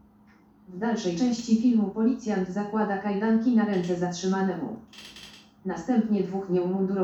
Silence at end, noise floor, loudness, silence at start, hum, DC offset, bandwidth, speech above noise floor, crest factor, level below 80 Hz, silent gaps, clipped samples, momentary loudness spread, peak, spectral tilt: 0 s; -57 dBFS; -26 LUFS; 0.7 s; none; under 0.1%; 8 kHz; 31 dB; 14 dB; -64 dBFS; none; under 0.1%; 18 LU; -12 dBFS; -6.5 dB/octave